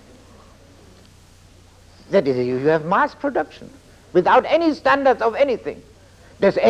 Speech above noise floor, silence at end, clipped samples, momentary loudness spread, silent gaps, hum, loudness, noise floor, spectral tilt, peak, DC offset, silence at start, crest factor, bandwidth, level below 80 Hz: 30 dB; 0 s; under 0.1%; 10 LU; none; none; -19 LUFS; -48 dBFS; -6.5 dB/octave; -2 dBFS; under 0.1%; 2.1 s; 18 dB; 10.5 kHz; -52 dBFS